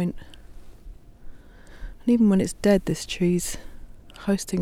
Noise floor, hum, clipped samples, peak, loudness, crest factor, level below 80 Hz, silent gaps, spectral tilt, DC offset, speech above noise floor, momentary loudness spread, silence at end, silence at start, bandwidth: -44 dBFS; none; under 0.1%; -6 dBFS; -23 LUFS; 18 dB; -42 dBFS; none; -6 dB/octave; under 0.1%; 22 dB; 21 LU; 0 s; 0 s; 16 kHz